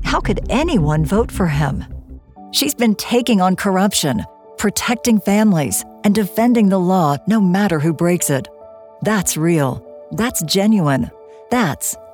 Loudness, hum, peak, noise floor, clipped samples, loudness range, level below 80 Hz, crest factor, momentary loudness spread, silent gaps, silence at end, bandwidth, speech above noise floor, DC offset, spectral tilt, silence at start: -16 LUFS; none; -2 dBFS; -40 dBFS; under 0.1%; 3 LU; -34 dBFS; 14 dB; 8 LU; none; 0.05 s; over 20 kHz; 24 dB; under 0.1%; -5 dB/octave; 0 s